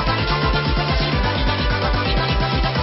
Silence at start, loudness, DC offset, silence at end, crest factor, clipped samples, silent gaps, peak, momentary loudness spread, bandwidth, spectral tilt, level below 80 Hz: 0 s; -19 LUFS; under 0.1%; 0 s; 12 dB; under 0.1%; none; -6 dBFS; 1 LU; 6 kHz; -3.5 dB/octave; -24 dBFS